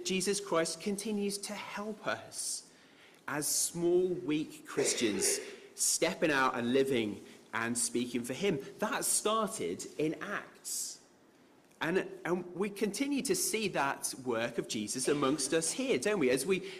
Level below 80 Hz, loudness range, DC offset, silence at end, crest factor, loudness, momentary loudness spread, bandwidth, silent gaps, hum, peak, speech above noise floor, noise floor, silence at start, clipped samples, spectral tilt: -72 dBFS; 5 LU; under 0.1%; 0 s; 16 dB; -33 LUFS; 9 LU; 16 kHz; none; none; -18 dBFS; 29 dB; -63 dBFS; 0 s; under 0.1%; -3 dB/octave